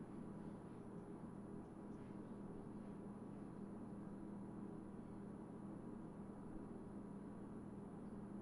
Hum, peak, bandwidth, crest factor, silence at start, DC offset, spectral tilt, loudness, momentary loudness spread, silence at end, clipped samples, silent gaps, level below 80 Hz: none; -40 dBFS; 10.5 kHz; 14 dB; 0 s; under 0.1%; -9 dB/octave; -54 LUFS; 2 LU; 0 s; under 0.1%; none; -70 dBFS